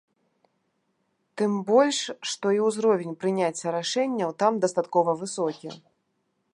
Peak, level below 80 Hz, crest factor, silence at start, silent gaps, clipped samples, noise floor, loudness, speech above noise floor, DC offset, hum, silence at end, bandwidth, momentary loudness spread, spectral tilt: -8 dBFS; -80 dBFS; 18 dB; 1.35 s; none; under 0.1%; -74 dBFS; -25 LUFS; 50 dB; under 0.1%; none; 0.75 s; 11.5 kHz; 9 LU; -4.5 dB/octave